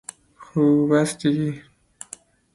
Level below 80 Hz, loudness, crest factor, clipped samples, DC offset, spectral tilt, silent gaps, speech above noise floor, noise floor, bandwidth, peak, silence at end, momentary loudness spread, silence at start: -60 dBFS; -21 LUFS; 16 dB; under 0.1%; under 0.1%; -6 dB/octave; none; 26 dB; -46 dBFS; 11.5 kHz; -8 dBFS; 0.95 s; 22 LU; 0.4 s